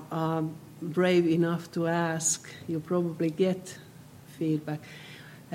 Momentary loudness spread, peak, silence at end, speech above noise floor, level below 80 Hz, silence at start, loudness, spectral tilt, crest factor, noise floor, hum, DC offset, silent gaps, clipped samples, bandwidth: 20 LU; -12 dBFS; 0 s; 21 dB; -72 dBFS; 0 s; -29 LUFS; -5 dB/octave; 16 dB; -50 dBFS; none; under 0.1%; none; under 0.1%; 16.5 kHz